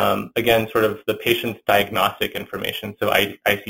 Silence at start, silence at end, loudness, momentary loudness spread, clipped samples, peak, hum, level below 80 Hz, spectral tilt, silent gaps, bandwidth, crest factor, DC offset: 0 s; 0 s; -20 LUFS; 8 LU; under 0.1%; 0 dBFS; none; -50 dBFS; -4 dB/octave; none; 17 kHz; 20 dB; under 0.1%